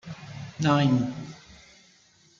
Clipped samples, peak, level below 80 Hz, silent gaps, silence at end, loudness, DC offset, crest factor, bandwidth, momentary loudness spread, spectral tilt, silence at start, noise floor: under 0.1%; -10 dBFS; -60 dBFS; none; 0.85 s; -24 LUFS; under 0.1%; 18 dB; 7.6 kHz; 21 LU; -6.5 dB/octave; 0.05 s; -60 dBFS